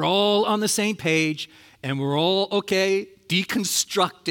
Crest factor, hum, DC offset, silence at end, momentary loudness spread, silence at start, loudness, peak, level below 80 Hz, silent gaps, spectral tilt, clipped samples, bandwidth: 16 dB; none; under 0.1%; 0 s; 8 LU; 0 s; -22 LUFS; -6 dBFS; -68 dBFS; none; -3.5 dB/octave; under 0.1%; 17.5 kHz